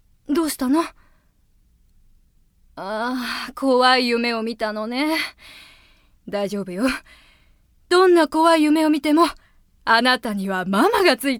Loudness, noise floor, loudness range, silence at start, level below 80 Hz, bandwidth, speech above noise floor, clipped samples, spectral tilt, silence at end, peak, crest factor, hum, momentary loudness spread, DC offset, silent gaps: -19 LUFS; -59 dBFS; 9 LU; 0.3 s; -54 dBFS; 18.5 kHz; 40 dB; under 0.1%; -4 dB/octave; 0 s; -2 dBFS; 18 dB; none; 12 LU; under 0.1%; none